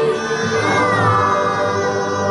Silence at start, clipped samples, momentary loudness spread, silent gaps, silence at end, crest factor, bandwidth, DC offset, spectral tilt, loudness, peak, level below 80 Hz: 0 s; under 0.1%; 5 LU; none; 0 s; 14 dB; 11 kHz; under 0.1%; -5 dB/octave; -16 LUFS; -4 dBFS; -50 dBFS